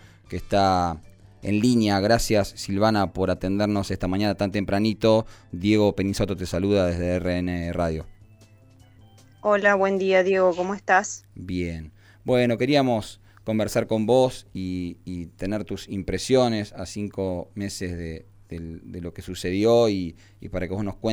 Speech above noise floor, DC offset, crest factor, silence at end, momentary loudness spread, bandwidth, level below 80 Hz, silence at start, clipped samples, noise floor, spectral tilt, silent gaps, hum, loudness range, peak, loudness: 29 dB; under 0.1%; 20 dB; 0 s; 16 LU; 19 kHz; -44 dBFS; 0.3 s; under 0.1%; -52 dBFS; -5.5 dB/octave; none; none; 5 LU; -4 dBFS; -24 LUFS